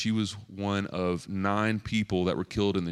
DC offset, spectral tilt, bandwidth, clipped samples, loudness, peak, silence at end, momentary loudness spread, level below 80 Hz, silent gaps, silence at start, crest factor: under 0.1%; -6 dB/octave; 11.5 kHz; under 0.1%; -29 LUFS; -12 dBFS; 0 s; 4 LU; -54 dBFS; none; 0 s; 18 dB